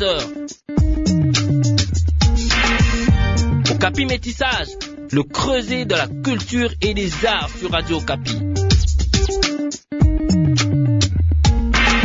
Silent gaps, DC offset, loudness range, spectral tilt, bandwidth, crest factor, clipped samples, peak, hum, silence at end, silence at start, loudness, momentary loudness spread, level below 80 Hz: none; under 0.1%; 3 LU; -5 dB/octave; 7.8 kHz; 14 dB; under 0.1%; -2 dBFS; none; 0 s; 0 s; -18 LUFS; 6 LU; -24 dBFS